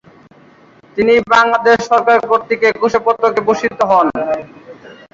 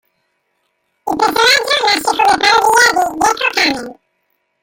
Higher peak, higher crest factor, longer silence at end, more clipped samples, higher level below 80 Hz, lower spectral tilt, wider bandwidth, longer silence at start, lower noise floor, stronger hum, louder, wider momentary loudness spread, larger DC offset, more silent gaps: about the same, -2 dBFS vs 0 dBFS; about the same, 12 dB vs 14 dB; second, 0.2 s vs 0.7 s; neither; about the same, -52 dBFS vs -50 dBFS; first, -4.5 dB/octave vs -0.5 dB/octave; second, 7.6 kHz vs 17 kHz; about the same, 0.95 s vs 1.05 s; second, -45 dBFS vs -66 dBFS; neither; about the same, -13 LUFS vs -11 LUFS; second, 8 LU vs 12 LU; neither; neither